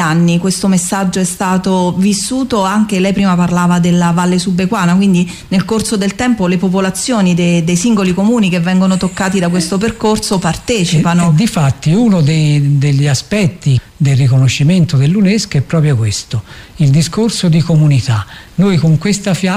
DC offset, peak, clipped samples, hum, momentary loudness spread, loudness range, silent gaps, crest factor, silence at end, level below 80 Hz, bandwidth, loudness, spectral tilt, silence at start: under 0.1%; -2 dBFS; under 0.1%; none; 4 LU; 1 LU; none; 8 dB; 0 s; -38 dBFS; 15 kHz; -12 LUFS; -6 dB/octave; 0 s